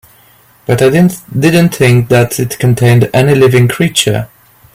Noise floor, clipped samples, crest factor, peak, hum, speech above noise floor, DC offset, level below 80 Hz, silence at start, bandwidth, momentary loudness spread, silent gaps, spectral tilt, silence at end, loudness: -45 dBFS; under 0.1%; 10 dB; 0 dBFS; none; 36 dB; under 0.1%; -42 dBFS; 0.7 s; 16.5 kHz; 6 LU; none; -5.5 dB/octave; 0.5 s; -9 LUFS